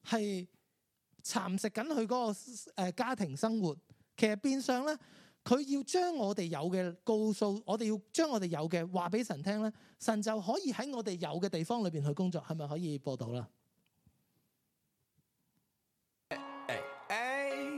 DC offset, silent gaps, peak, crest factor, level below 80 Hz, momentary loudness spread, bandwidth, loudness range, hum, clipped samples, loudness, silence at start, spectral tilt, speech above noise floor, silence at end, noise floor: under 0.1%; none; -14 dBFS; 22 dB; -84 dBFS; 9 LU; 15 kHz; 10 LU; none; under 0.1%; -36 LUFS; 0.05 s; -5.5 dB/octave; 48 dB; 0 s; -83 dBFS